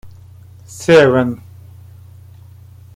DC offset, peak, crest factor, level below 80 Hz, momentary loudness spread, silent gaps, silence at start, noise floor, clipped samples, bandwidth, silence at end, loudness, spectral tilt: under 0.1%; 0 dBFS; 18 dB; -52 dBFS; 22 LU; none; 0.05 s; -40 dBFS; under 0.1%; 15.5 kHz; 1.6 s; -12 LUFS; -6 dB/octave